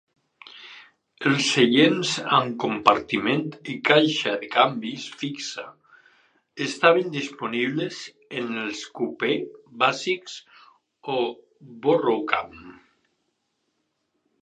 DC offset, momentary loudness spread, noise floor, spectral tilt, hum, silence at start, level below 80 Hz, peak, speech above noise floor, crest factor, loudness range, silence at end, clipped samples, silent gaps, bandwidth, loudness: under 0.1%; 19 LU; -75 dBFS; -4 dB/octave; none; 0.45 s; -68 dBFS; 0 dBFS; 51 dB; 24 dB; 7 LU; 1.7 s; under 0.1%; none; 10 kHz; -23 LUFS